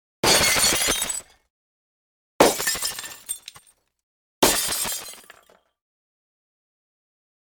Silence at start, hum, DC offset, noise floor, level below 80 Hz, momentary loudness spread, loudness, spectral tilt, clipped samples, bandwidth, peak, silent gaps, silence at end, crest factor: 0.25 s; none; under 0.1%; -57 dBFS; -50 dBFS; 16 LU; -20 LUFS; -1 dB/octave; under 0.1%; over 20 kHz; -2 dBFS; 1.50-2.39 s, 4.03-4.42 s; 2.35 s; 24 dB